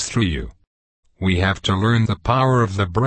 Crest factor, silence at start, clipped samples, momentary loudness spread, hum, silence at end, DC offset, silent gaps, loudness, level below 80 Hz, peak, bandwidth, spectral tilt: 16 dB; 0 s; under 0.1%; 8 LU; none; 0 s; under 0.1%; 0.67-1.03 s; -19 LUFS; -36 dBFS; -4 dBFS; 8.8 kHz; -5.5 dB/octave